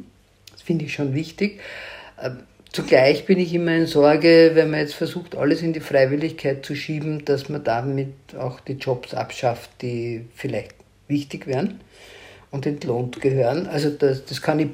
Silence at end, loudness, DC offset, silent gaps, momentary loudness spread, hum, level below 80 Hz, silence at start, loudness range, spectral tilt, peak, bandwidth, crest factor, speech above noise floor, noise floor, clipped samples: 0 s; -21 LUFS; under 0.1%; none; 16 LU; none; -58 dBFS; 0 s; 10 LU; -6.5 dB/octave; -2 dBFS; 16 kHz; 20 dB; 30 dB; -51 dBFS; under 0.1%